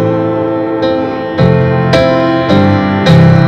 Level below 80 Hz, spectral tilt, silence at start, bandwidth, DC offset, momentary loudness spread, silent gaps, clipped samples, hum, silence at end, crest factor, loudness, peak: -34 dBFS; -8 dB/octave; 0 s; 8.4 kHz; under 0.1%; 6 LU; none; 0.2%; none; 0 s; 8 dB; -10 LUFS; 0 dBFS